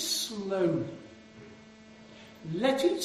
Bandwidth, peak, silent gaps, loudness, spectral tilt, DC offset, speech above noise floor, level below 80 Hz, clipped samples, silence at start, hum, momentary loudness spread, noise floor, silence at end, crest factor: 14 kHz; -14 dBFS; none; -30 LUFS; -4 dB/octave; under 0.1%; 23 dB; -68 dBFS; under 0.1%; 0 s; none; 24 LU; -52 dBFS; 0 s; 18 dB